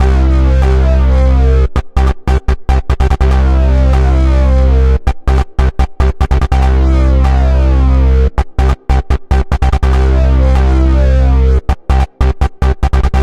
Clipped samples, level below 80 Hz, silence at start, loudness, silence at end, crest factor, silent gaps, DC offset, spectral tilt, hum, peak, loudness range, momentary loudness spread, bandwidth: under 0.1%; -10 dBFS; 0 s; -12 LUFS; 0 s; 8 dB; none; 2%; -8 dB/octave; none; 0 dBFS; 0 LU; 4 LU; 6.6 kHz